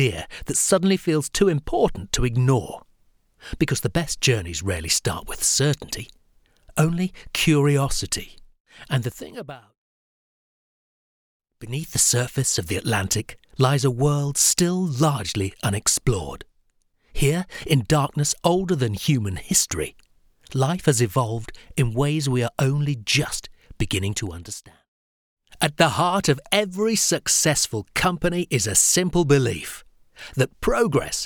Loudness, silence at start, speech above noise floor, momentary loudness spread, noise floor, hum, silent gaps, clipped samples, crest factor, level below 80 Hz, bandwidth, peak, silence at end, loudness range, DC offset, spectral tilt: -22 LUFS; 0 s; 43 dB; 13 LU; -65 dBFS; none; 8.60-8.65 s, 9.77-11.40 s, 24.88-25.37 s; under 0.1%; 20 dB; -42 dBFS; 20 kHz; -4 dBFS; 0 s; 5 LU; under 0.1%; -4 dB/octave